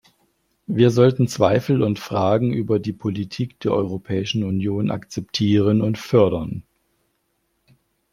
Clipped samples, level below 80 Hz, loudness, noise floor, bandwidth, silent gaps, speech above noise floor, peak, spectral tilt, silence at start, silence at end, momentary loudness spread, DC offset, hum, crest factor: under 0.1%; -54 dBFS; -20 LUFS; -70 dBFS; 15 kHz; none; 51 dB; -2 dBFS; -7 dB/octave; 0.7 s; 1.5 s; 10 LU; under 0.1%; none; 20 dB